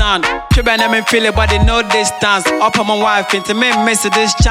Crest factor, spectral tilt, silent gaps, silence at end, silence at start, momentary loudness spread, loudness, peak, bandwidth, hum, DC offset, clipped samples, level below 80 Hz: 12 dB; -3.5 dB/octave; none; 0 s; 0 s; 2 LU; -12 LUFS; 0 dBFS; 16.5 kHz; none; under 0.1%; under 0.1%; -22 dBFS